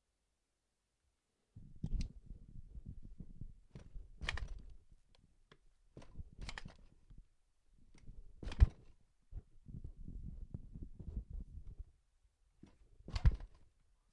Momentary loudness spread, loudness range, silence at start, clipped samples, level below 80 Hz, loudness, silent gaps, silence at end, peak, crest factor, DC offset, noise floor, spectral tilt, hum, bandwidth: 25 LU; 13 LU; 1.55 s; under 0.1%; -44 dBFS; -44 LUFS; none; 0.45 s; -14 dBFS; 30 dB; under 0.1%; -86 dBFS; -6 dB/octave; none; 9.8 kHz